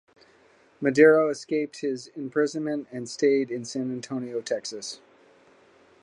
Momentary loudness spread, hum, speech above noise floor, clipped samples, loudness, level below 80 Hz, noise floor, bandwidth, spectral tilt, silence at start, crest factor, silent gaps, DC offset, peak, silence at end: 17 LU; none; 34 dB; under 0.1%; -25 LUFS; -76 dBFS; -59 dBFS; 10.5 kHz; -5 dB/octave; 0.8 s; 22 dB; none; under 0.1%; -4 dBFS; 1.05 s